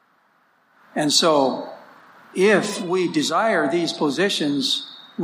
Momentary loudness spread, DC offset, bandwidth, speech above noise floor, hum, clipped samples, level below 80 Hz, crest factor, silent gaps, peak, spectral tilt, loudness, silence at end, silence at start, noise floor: 14 LU; under 0.1%; 15.5 kHz; 41 dB; none; under 0.1%; -74 dBFS; 20 dB; none; -2 dBFS; -3.5 dB/octave; -20 LUFS; 0 s; 0.95 s; -61 dBFS